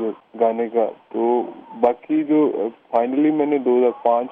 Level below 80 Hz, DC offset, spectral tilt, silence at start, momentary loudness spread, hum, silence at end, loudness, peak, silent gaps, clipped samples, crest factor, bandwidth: -70 dBFS; under 0.1%; -9.5 dB/octave; 0 s; 6 LU; none; 0 s; -20 LUFS; -4 dBFS; none; under 0.1%; 16 dB; 3.7 kHz